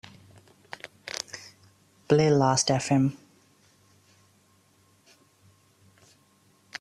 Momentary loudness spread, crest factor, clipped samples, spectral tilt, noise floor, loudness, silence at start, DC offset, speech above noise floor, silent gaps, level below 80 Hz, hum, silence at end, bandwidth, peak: 23 LU; 22 dB; under 0.1%; -5 dB/octave; -63 dBFS; -25 LUFS; 1.05 s; under 0.1%; 41 dB; none; -64 dBFS; none; 0.05 s; 13 kHz; -8 dBFS